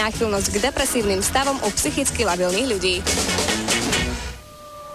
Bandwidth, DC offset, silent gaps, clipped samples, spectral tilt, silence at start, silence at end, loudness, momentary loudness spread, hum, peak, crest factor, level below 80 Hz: 15.5 kHz; under 0.1%; none; under 0.1%; -2.5 dB/octave; 0 s; 0 s; -20 LUFS; 9 LU; none; -6 dBFS; 14 dB; -36 dBFS